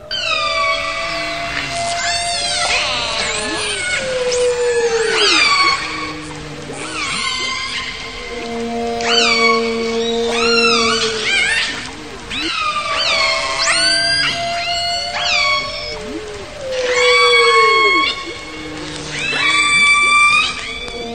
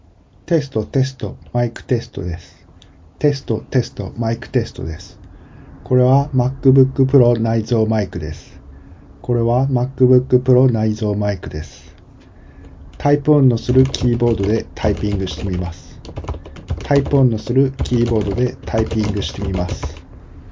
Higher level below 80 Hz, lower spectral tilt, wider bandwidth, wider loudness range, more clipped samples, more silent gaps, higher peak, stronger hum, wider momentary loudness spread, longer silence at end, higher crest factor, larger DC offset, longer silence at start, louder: second, -42 dBFS vs -32 dBFS; second, -1 dB/octave vs -8 dB/octave; first, 14.5 kHz vs 7.6 kHz; about the same, 4 LU vs 6 LU; neither; neither; about the same, 0 dBFS vs 0 dBFS; neither; about the same, 15 LU vs 15 LU; about the same, 0 s vs 0 s; about the same, 16 dB vs 18 dB; first, 0.8% vs under 0.1%; second, 0 s vs 0.5 s; first, -14 LUFS vs -18 LUFS